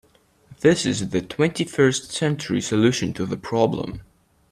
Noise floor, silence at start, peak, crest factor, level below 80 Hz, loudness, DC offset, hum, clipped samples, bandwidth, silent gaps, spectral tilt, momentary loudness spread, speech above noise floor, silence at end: -51 dBFS; 0.5 s; -4 dBFS; 18 dB; -52 dBFS; -22 LUFS; under 0.1%; none; under 0.1%; 13.5 kHz; none; -5 dB/octave; 8 LU; 30 dB; 0.5 s